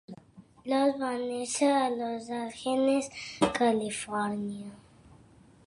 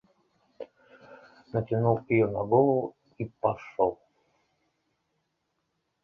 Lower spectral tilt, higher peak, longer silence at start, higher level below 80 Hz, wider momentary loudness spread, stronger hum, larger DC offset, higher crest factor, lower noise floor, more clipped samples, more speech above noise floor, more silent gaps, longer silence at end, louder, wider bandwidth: second, -4 dB/octave vs -10.5 dB/octave; about the same, -10 dBFS vs -10 dBFS; second, 0.1 s vs 0.6 s; about the same, -64 dBFS vs -62 dBFS; second, 15 LU vs 23 LU; neither; neither; about the same, 22 dB vs 20 dB; second, -57 dBFS vs -79 dBFS; neither; second, 28 dB vs 53 dB; neither; second, 0.85 s vs 2.1 s; about the same, -29 LUFS vs -27 LUFS; first, 11.5 kHz vs 6.2 kHz